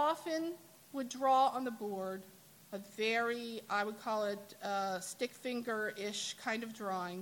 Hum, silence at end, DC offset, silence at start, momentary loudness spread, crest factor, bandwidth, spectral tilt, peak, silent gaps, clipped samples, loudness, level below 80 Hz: none; 0 s; under 0.1%; 0 s; 12 LU; 18 dB; 17.5 kHz; -3 dB/octave; -20 dBFS; none; under 0.1%; -37 LUFS; -86 dBFS